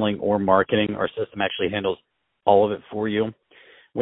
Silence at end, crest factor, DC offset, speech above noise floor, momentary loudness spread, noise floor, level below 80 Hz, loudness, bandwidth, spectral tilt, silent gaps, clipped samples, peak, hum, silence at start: 0 s; 20 dB; under 0.1%; 31 dB; 9 LU; -52 dBFS; -58 dBFS; -23 LUFS; 4 kHz; -10.5 dB/octave; none; under 0.1%; -2 dBFS; none; 0 s